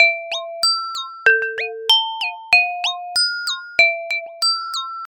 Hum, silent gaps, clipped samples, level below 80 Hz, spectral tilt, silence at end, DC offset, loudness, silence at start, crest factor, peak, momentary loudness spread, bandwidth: none; none; under 0.1%; -66 dBFS; 2.5 dB/octave; 0 s; under 0.1%; -17 LUFS; 0 s; 20 dB; 0 dBFS; 10 LU; 17.5 kHz